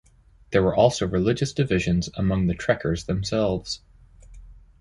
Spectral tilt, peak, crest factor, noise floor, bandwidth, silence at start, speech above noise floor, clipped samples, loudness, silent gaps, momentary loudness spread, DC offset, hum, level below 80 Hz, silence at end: -6 dB/octave; -4 dBFS; 20 dB; -52 dBFS; 11.5 kHz; 0.5 s; 29 dB; under 0.1%; -24 LUFS; none; 6 LU; under 0.1%; none; -40 dBFS; 0.3 s